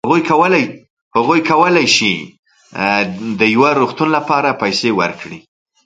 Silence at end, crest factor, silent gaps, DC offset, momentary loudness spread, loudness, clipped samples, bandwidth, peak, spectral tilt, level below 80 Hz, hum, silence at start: 0.45 s; 14 dB; 0.90-1.11 s, 2.39-2.43 s; under 0.1%; 10 LU; -14 LUFS; under 0.1%; 9.4 kHz; 0 dBFS; -4 dB/octave; -56 dBFS; none; 0.05 s